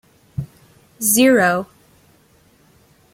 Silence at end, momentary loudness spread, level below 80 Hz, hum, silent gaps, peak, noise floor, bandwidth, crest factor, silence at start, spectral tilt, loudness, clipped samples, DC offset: 1.5 s; 23 LU; -54 dBFS; none; none; -2 dBFS; -54 dBFS; 16.5 kHz; 18 dB; 0.4 s; -3.5 dB/octave; -15 LUFS; under 0.1%; under 0.1%